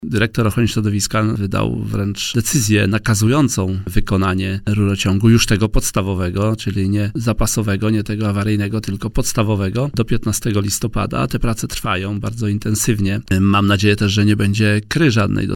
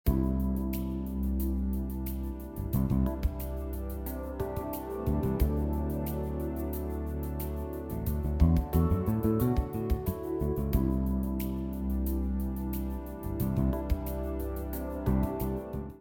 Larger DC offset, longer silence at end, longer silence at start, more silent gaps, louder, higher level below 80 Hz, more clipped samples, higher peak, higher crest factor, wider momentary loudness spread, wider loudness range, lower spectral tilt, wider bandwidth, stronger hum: neither; about the same, 0 s vs 0 s; about the same, 0 s vs 0.05 s; neither; first, -17 LUFS vs -32 LUFS; about the same, -30 dBFS vs -34 dBFS; neither; first, 0 dBFS vs -10 dBFS; about the same, 16 dB vs 20 dB; second, 6 LU vs 9 LU; about the same, 3 LU vs 4 LU; second, -5 dB/octave vs -8.5 dB/octave; about the same, 17.5 kHz vs 17.5 kHz; neither